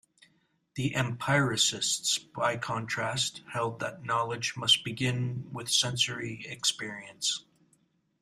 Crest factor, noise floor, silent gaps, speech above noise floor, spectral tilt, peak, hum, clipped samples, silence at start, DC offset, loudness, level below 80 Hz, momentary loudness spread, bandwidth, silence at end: 22 dB; -71 dBFS; none; 40 dB; -2.5 dB/octave; -10 dBFS; none; under 0.1%; 0.75 s; under 0.1%; -29 LUFS; -66 dBFS; 12 LU; 15.5 kHz; 0.8 s